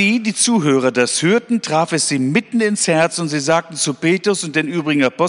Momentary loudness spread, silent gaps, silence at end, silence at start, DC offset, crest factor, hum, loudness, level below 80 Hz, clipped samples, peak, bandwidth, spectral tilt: 4 LU; none; 0 s; 0 s; under 0.1%; 14 dB; none; -16 LUFS; -64 dBFS; under 0.1%; -2 dBFS; 11 kHz; -4 dB/octave